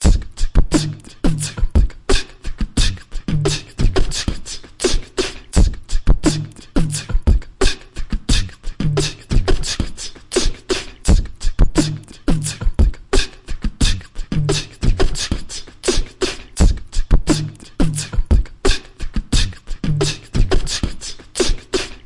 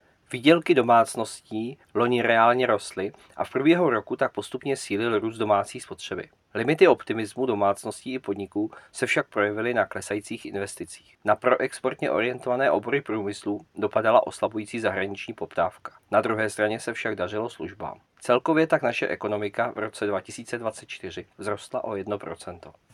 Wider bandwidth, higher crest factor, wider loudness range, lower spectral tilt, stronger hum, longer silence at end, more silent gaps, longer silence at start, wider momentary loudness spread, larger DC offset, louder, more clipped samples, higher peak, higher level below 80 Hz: second, 11.5 kHz vs 13.5 kHz; second, 12 dB vs 22 dB; second, 1 LU vs 5 LU; about the same, -4.5 dB/octave vs -5 dB/octave; neither; second, 0.1 s vs 0.25 s; neither; second, 0 s vs 0.3 s; second, 8 LU vs 15 LU; neither; first, -21 LUFS vs -25 LUFS; neither; about the same, -4 dBFS vs -4 dBFS; first, -20 dBFS vs -70 dBFS